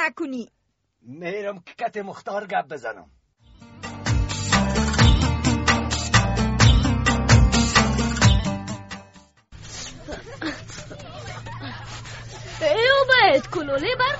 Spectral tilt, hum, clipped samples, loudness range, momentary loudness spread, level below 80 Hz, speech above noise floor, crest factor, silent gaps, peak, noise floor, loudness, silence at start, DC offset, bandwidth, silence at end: -4.5 dB/octave; none; under 0.1%; 16 LU; 20 LU; -30 dBFS; 43 dB; 20 dB; none; -2 dBFS; -67 dBFS; -20 LUFS; 0 s; under 0.1%; 8.2 kHz; 0 s